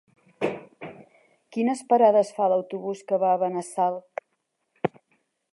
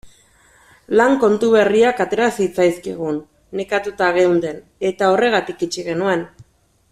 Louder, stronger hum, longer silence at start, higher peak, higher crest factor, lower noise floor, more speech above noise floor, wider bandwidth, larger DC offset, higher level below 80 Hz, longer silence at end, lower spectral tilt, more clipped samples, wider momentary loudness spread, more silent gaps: second, -25 LUFS vs -17 LUFS; neither; first, 0.4 s vs 0.05 s; second, -6 dBFS vs -2 dBFS; about the same, 20 dB vs 16 dB; first, -76 dBFS vs -54 dBFS; first, 53 dB vs 37 dB; second, 11.5 kHz vs 14 kHz; neither; second, -74 dBFS vs -56 dBFS; first, 0.65 s vs 0.5 s; about the same, -6 dB/octave vs -5 dB/octave; neither; first, 20 LU vs 11 LU; neither